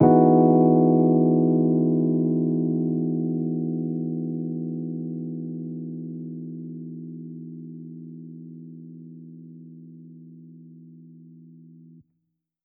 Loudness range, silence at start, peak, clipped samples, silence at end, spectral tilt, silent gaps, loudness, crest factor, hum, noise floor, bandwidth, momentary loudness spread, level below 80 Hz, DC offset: 24 LU; 0 s; -4 dBFS; under 0.1%; 1.45 s; -14.5 dB/octave; none; -22 LUFS; 20 dB; none; -77 dBFS; 2.3 kHz; 25 LU; -70 dBFS; under 0.1%